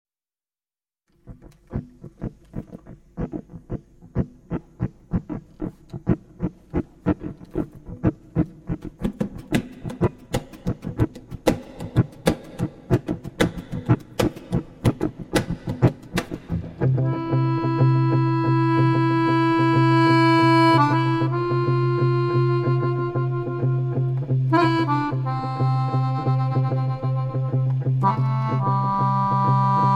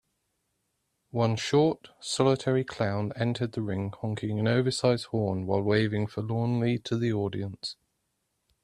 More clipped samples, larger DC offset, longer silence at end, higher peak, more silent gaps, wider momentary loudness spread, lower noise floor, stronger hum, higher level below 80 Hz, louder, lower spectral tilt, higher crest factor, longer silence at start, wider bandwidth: neither; neither; second, 0 s vs 0.9 s; first, -2 dBFS vs -10 dBFS; neither; first, 14 LU vs 8 LU; first, under -90 dBFS vs -78 dBFS; neither; first, -42 dBFS vs -62 dBFS; first, -22 LUFS vs -28 LUFS; first, -7.5 dB/octave vs -6 dB/octave; about the same, 20 dB vs 20 dB; about the same, 1.25 s vs 1.15 s; about the same, 12 kHz vs 11 kHz